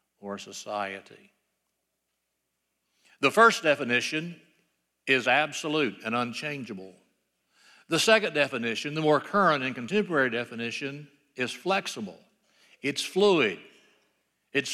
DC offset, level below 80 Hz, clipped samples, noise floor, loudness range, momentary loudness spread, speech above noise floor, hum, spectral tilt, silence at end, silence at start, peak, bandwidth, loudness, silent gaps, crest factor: under 0.1%; -80 dBFS; under 0.1%; -80 dBFS; 5 LU; 17 LU; 54 dB; none; -3.5 dB/octave; 0 s; 0.25 s; -8 dBFS; 14.5 kHz; -26 LUFS; none; 22 dB